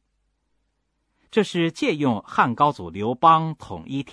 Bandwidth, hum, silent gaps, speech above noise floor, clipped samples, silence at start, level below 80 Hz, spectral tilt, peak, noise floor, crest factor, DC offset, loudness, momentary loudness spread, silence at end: 11 kHz; none; none; 51 dB; under 0.1%; 1.35 s; -60 dBFS; -6 dB/octave; -4 dBFS; -73 dBFS; 20 dB; under 0.1%; -22 LUFS; 13 LU; 0 s